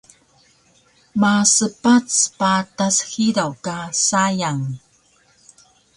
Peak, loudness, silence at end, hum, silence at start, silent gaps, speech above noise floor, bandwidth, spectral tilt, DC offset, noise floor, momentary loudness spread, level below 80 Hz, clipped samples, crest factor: 0 dBFS; -18 LUFS; 1.2 s; none; 1.15 s; none; 39 dB; 11.5 kHz; -3 dB/octave; under 0.1%; -57 dBFS; 12 LU; -60 dBFS; under 0.1%; 20 dB